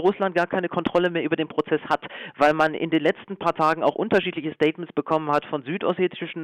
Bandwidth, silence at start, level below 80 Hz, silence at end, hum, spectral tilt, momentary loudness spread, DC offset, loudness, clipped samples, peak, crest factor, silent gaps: 10.5 kHz; 0 s; -62 dBFS; 0 s; none; -6.5 dB/octave; 6 LU; under 0.1%; -23 LUFS; under 0.1%; -8 dBFS; 14 dB; none